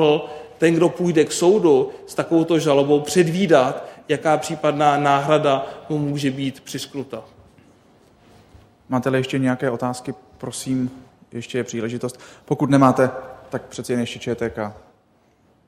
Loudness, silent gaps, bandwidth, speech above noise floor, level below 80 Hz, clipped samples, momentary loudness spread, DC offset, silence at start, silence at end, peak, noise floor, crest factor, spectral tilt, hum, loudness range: -20 LUFS; none; 16 kHz; 39 dB; -58 dBFS; under 0.1%; 15 LU; under 0.1%; 0 s; 0.9 s; 0 dBFS; -59 dBFS; 20 dB; -5.5 dB/octave; none; 9 LU